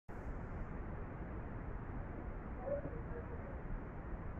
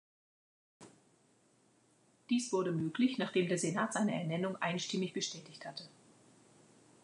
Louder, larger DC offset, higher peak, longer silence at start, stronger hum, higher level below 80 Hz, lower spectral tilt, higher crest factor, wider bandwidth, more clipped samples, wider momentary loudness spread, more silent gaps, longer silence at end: second, -47 LUFS vs -36 LUFS; neither; second, -28 dBFS vs -20 dBFS; second, 0.1 s vs 0.8 s; neither; first, -48 dBFS vs -84 dBFS; first, -10 dB/octave vs -4.5 dB/octave; about the same, 16 dB vs 18 dB; second, 3.5 kHz vs 11 kHz; neither; second, 5 LU vs 14 LU; neither; second, 0 s vs 1.15 s